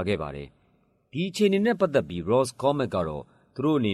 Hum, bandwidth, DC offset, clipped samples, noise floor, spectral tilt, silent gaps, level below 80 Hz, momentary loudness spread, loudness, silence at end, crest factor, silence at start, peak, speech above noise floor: none; 13 kHz; under 0.1%; under 0.1%; -66 dBFS; -6 dB/octave; none; -54 dBFS; 16 LU; -26 LUFS; 0 s; 16 dB; 0 s; -10 dBFS; 41 dB